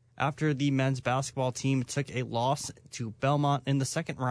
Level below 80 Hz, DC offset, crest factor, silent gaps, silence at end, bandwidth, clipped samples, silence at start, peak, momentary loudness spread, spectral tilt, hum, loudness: -64 dBFS; under 0.1%; 16 dB; none; 0 s; 11 kHz; under 0.1%; 0.2 s; -14 dBFS; 5 LU; -5.5 dB/octave; none; -30 LUFS